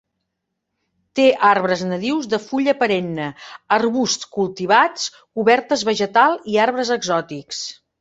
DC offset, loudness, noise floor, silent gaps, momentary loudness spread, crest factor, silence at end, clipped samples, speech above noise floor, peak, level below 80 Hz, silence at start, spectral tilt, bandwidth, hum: under 0.1%; -18 LUFS; -77 dBFS; none; 12 LU; 18 dB; 0.3 s; under 0.1%; 59 dB; -2 dBFS; -64 dBFS; 1.15 s; -4 dB/octave; 8 kHz; none